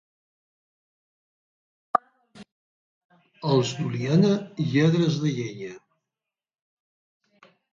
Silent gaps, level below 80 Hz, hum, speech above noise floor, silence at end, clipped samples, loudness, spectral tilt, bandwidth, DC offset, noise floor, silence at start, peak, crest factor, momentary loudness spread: 2.52-3.09 s; -70 dBFS; none; 66 dB; 1.95 s; under 0.1%; -24 LUFS; -7 dB/octave; 7.6 kHz; under 0.1%; -89 dBFS; 1.95 s; -4 dBFS; 24 dB; 12 LU